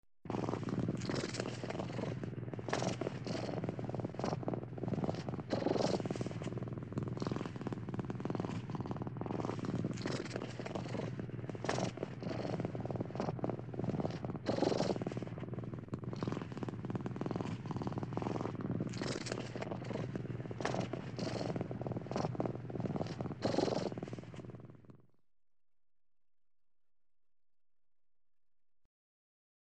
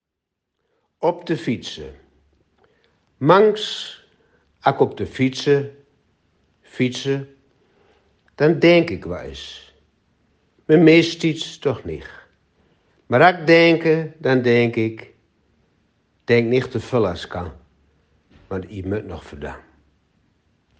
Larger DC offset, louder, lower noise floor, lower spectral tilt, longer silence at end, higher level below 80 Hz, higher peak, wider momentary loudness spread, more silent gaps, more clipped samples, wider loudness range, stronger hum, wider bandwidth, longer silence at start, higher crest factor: neither; second, -40 LUFS vs -18 LUFS; second, -62 dBFS vs -81 dBFS; about the same, -6.5 dB/octave vs -6.5 dB/octave; first, 4.65 s vs 1.25 s; second, -64 dBFS vs -54 dBFS; second, -18 dBFS vs 0 dBFS; second, 7 LU vs 21 LU; neither; neither; second, 3 LU vs 8 LU; neither; about the same, 9.2 kHz vs 8.8 kHz; second, 0.25 s vs 1 s; about the same, 24 dB vs 20 dB